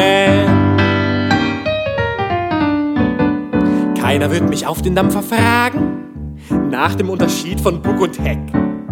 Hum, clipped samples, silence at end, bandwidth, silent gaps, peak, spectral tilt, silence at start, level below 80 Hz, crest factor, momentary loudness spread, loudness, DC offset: none; under 0.1%; 0 s; 17.5 kHz; none; 0 dBFS; -6 dB/octave; 0 s; -34 dBFS; 14 dB; 6 LU; -15 LUFS; under 0.1%